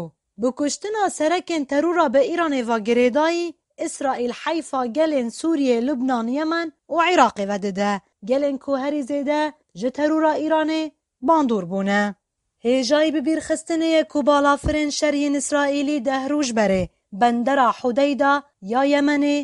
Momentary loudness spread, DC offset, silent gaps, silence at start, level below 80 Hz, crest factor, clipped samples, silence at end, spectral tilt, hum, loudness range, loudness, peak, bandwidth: 7 LU; under 0.1%; none; 0 s; -48 dBFS; 20 dB; under 0.1%; 0 s; -4.5 dB/octave; none; 2 LU; -21 LUFS; -2 dBFS; 11.5 kHz